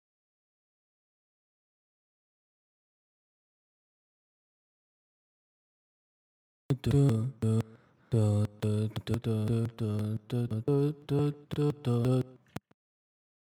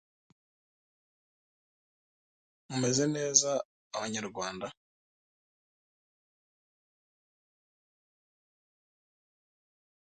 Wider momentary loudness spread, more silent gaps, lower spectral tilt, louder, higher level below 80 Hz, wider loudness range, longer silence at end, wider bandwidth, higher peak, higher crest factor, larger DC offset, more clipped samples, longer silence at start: second, 7 LU vs 15 LU; second, none vs 3.65-3.91 s; first, -8.5 dB/octave vs -3 dB/octave; about the same, -31 LUFS vs -30 LUFS; first, -60 dBFS vs -76 dBFS; second, 4 LU vs 12 LU; second, 1.1 s vs 5.35 s; first, 12.5 kHz vs 9 kHz; second, -14 dBFS vs -6 dBFS; second, 20 dB vs 32 dB; neither; neither; first, 6.7 s vs 2.7 s